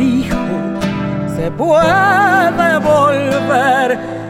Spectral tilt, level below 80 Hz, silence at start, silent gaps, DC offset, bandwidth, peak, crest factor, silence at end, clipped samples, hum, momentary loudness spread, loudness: -6 dB/octave; -38 dBFS; 0 s; none; under 0.1%; 16.5 kHz; 0 dBFS; 12 dB; 0 s; under 0.1%; none; 9 LU; -13 LUFS